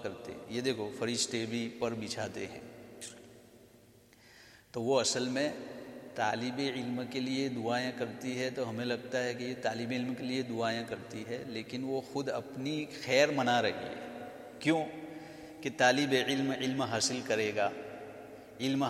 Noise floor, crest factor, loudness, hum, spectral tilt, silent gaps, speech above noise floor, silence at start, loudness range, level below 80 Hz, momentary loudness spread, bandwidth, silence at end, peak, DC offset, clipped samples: -60 dBFS; 24 dB; -34 LUFS; none; -4 dB/octave; none; 27 dB; 0 s; 6 LU; -74 dBFS; 17 LU; 15 kHz; 0 s; -10 dBFS; under 0.1%; under 0.1%